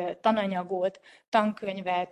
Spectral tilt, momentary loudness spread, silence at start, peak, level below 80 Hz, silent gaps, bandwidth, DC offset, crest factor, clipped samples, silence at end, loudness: -6.5 dB/octave; 5 LU; 0 s; -8 dBFS; -74 dBFS; 1.28-1.32 s; 11 kHz; under 0.1%; 20 dB; under 0.1%; 0 s; -28 LUFS